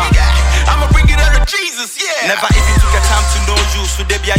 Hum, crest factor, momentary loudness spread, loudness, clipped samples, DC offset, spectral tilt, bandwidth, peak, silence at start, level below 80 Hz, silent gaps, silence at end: none; 10 dB; 5 LU; -12 LUFS; under 0.1%; under 0.1%; -3.5 dB/octave; 16 kHz; 0 dBFS; 0 s; -12 dBFS; none; 0 s